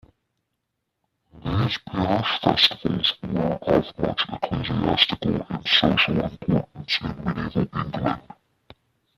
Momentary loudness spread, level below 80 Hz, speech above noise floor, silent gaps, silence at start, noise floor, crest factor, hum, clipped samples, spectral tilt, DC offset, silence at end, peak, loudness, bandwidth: 9 LU; -46 dBFS; 55 dB; none; 1.35 s; -79 dBFS; 22 dB; none; under 0.1%; -6 dB/octave; under 0.1%; 0.95 s; -2 dBFS; -23 LUFS; 14 kHz